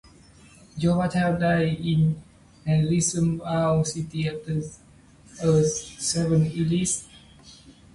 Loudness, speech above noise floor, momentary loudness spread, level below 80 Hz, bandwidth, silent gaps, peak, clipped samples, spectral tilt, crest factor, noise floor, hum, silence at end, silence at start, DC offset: -24 LUFS; 29 dB; 8 LU; -50 dBFS; 11.5 kHz; none; -10 dBFS; under 0.1%; -5.5 dB/octave; 14 dB; -52 dBFS; none; 0.25 s; 0.75 s; under 0.1%